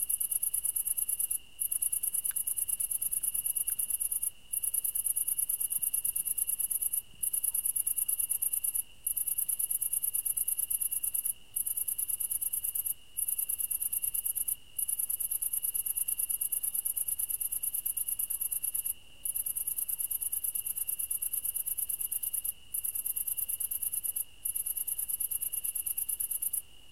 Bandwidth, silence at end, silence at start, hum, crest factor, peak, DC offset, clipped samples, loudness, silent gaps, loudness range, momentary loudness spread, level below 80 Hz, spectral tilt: 17 kHz; 0.05 s; 0 s; none; 20 dB; -14 dBFS; 0.3%; under 0.1%; -30 LUFS; none; 2 LU; 4 LU; -64 dBFS; 1.5 dB/octave